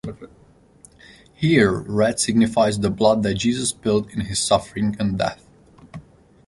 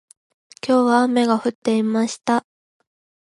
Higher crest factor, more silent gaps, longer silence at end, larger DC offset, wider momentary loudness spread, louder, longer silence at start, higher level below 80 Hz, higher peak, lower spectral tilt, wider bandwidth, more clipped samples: about the same, 18 dB vs 18 dB; second, none vs 1.55-1.62 s; second, 0.45 s vs 0.95 s; neither; about the same, 8 LU vs 6 LU; about the same, -20 LUFS vs -19 LUFS; second, 0.05 s vs 0.65 s; first, -46 dBFS vs -72 dBFS; about the same, -2 dBFS vs -4 dBFS; about the same, -5 dB/octave vs -5 dB/octave; about the same, 11.5 kHz vs 11.5 kHz; neither